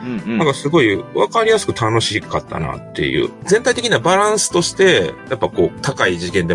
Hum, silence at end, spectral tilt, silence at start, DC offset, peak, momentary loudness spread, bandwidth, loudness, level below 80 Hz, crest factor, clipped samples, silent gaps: none; 0 s; -4 dB/octave; 0 s; under 0.1%; 0 dBFS; 8 LU; 11.5 kHz; -16 LUFS; -46 dBFS; 16 dB; under 0.1%; none